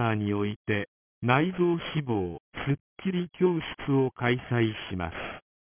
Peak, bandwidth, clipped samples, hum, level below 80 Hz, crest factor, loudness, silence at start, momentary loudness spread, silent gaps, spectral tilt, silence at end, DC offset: -6 dBFS; 3.6 kHz; under 0.1%; none; -52 dBFS; 22 dB; -29 LUFS; 0 s; 10 LU; 0.56-0.65 s, 0.88-1.21 s, 2.40-2.52 s, 2.80-2.96 s; -5.5 dB/octave; 0.3 s; under 0.1%